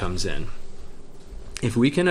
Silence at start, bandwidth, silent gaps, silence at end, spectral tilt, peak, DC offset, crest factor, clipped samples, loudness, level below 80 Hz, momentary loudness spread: 0 s; 12.5 kHz; none; 0 s; -5.5 dB/octave; -6 dBFS; under 0.1%; 18 dB; under 0.1%; -25 LUFS; -36 dBFS; 25 LU